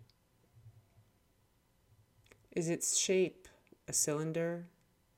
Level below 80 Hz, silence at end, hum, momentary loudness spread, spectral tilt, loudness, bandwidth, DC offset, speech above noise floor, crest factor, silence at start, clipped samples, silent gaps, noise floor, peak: -74 dBFS; 0.5 s; none; 12 LU; -3.5 dB/octave; -34 LUFS; 17.5 kHz; under 0.1%; 38 dB; 20 dB; 0 s; under 0.1%; none; -73 dBFS; -18 dBFS